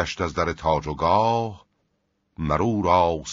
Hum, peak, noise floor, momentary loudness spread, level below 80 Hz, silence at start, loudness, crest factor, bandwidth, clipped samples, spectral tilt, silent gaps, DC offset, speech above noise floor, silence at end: none; -6 dBFS; -72 dBFS; 7 LU; -44 dBFS; 0 s; -23 LUFS; 18 dB; 7.6 kHz; under 0.1%; -5 dB/octave; none; under 0.1%; 50 dB; 0 s